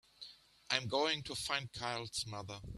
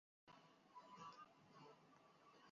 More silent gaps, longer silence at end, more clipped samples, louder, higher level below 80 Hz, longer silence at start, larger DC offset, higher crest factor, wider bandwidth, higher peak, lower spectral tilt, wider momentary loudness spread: neither; about the same, 0 s vs 0 s; neither; first, -38 LUFS vs -64 LUFS; first, -64 dBFS vs under -90 dBFS; about the same, 0.2 s vs 0.25 s; neither; first, 28 dB vs 18 dB; first, 14 kHz vs 7.2 kHz; first, -14 dBFS vs -48 dBFS; about the same, -3 dB/octave vs -3 dB/octave; first, 17 LU vs 9 LU